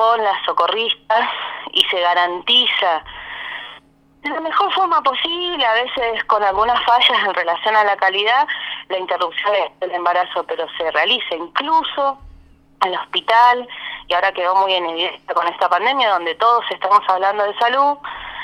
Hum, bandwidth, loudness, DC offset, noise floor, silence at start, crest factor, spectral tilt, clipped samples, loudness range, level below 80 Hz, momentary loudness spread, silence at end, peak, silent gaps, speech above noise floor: none; 16 kHz; -17 LUFS; under 0.1%; -48 dBFS; 0 s; 18 dB; -2.5 dB/octave; under 0.1%; 3 LU; -54 dBFS; 11 LU; 0 s; 0 dBFS; none; 31 dB